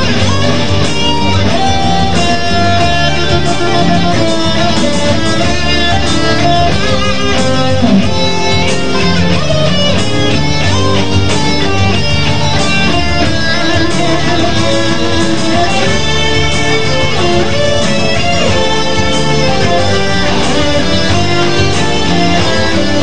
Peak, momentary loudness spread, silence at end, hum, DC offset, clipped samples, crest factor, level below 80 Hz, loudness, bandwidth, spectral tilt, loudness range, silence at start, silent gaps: 0 dBFS; 2 LU; 0 s; none; 20%; under 0.1%; 12 dB; -24 dBFS; -11 LUFS; 10 kHz; -4.5 dB/octave; 0 LU; 0 s; none